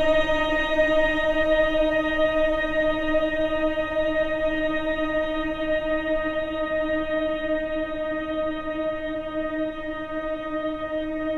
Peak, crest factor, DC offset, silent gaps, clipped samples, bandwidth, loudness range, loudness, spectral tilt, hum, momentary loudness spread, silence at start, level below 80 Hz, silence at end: -10 dBFS; 14 dB; under 0.1%; none; under 0.1%; 7.6 kHz; 6 LU; -24 LUFS; -5.5 dB/octave; none; 8 LU; 0 s; -38 dBFS; 0 s